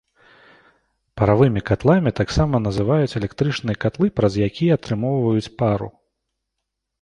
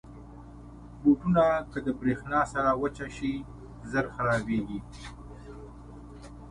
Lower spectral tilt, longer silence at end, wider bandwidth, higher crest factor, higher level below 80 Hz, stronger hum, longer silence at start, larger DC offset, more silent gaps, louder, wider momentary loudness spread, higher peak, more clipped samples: about the same, -7.5 dB/octave vs -7 dB/octave; first, 1.1 s vs 0 s; about the same, 10.5 kHz vs 11 kHz; about the same, 18 dB vs 18 dB; first, -40 dBFS vs -48 dBFS; neither; first, 1.15 s vs 0.05 s; neither; neither; first, -20 LUFS vs -28 LUFS; second, 6 LU vs 24 LU; first, -2 dBFS vs -12 dBFS; neither